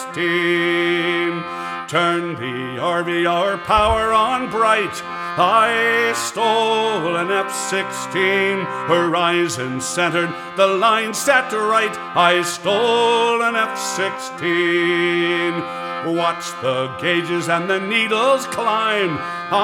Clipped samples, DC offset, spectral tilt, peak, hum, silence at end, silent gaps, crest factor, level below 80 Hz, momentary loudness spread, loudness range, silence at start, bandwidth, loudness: under 0.1%; under 0.1%; -3.5 dB/octave; 0 dBFS; none; 0 s; none; 18 dB; -46 dBFS; 7 LU; 3 LU; 0 s; 17 kHz; -18 LUFS